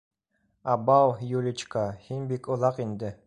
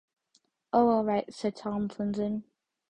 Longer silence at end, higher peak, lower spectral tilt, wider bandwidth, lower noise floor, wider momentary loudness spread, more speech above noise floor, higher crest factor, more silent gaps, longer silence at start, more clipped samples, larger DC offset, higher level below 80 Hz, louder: second, 0.1 s vs 0.5 s; about the same, -8 dBFS vs -10 dBFS; about the same, -7 dB/octave vs -7.5 dB/octave; about the same, 10.5 kHz vs 9.8 kHz; about the same, -74 dBFS vs -71 dBFS; first, 12 LU vs 9 LU; first, 47 dB vs 43 dB; about the same, 18 dB vs 20 dB; neither; about the same, 0.65 s vs 0.75 s; neither; neither; about the same, -62 dBFS vs -64 dBFS; about the same, -27 LUFS vs -29 LUFS